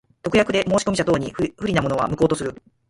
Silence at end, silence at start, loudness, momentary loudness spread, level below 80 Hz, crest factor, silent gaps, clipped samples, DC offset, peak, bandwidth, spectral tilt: 0.35 s; 0.25 s; -21 LUFS; 7 LU; -46 dBFS; 18 dB; none; under 0.1%; under 0.1%; -4 dBFS; 11.5 kHz; -5.5 dB/octave